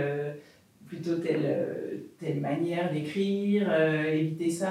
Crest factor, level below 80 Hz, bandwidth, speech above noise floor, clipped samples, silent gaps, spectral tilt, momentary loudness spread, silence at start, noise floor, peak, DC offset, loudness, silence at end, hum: 16 dB; -80 dBFS; 14.5 kHz; 27 dB; under 0.1%; none; -6.5 dB/octave; 13 LU; 0 s; -55 dBFS; -12 dBFS; under 0.1%; -29 LUFS; 0 s; none